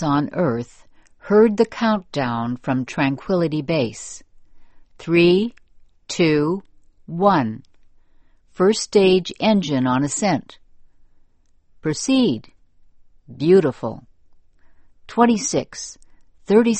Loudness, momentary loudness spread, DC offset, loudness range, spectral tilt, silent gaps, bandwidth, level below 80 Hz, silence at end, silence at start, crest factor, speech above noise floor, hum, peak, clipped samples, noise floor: -19 LUFS; 15 LU; under 0.1%; 3 LU; -5.5 dB/octave; none; 8.8 kHz; -54 dBFS; 0 s; 0 s; 20 dB; 36 dB; none; -2 dBFS; under 0.1%; -55 dBFS